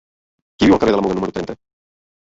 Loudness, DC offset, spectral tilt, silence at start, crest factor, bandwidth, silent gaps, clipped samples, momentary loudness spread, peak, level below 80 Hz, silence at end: -17 LUFS; under 0.1%; -6.5 dB/octave; 0.6 s; 18 dB; 7.8 kHz; none; under 0.1%; 16 LU; -2 dBFS; -44 dBFS; 0.7 s